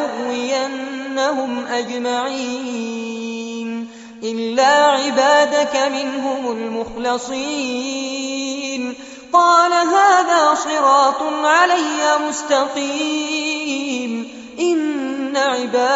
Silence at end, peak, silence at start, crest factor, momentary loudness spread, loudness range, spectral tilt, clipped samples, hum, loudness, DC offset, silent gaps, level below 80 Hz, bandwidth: 0 s; -2 dBFS; 0 s; 16 dB; 13 LU; 8 LU; 0 dB/octave; under 0.1%; none; -18 LUFS; under 0.1%; none; -60 dBFS; 8 kHz